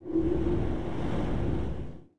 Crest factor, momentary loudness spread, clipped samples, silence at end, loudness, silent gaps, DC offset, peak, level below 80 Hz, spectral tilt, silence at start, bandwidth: 12 dB; 7 LU; under 0.1%; 0 s; -31 LUFS; none; 2%; -16 dBFS; -38 dBFS; -9 dB/octave; 0 s; 9.6 kHz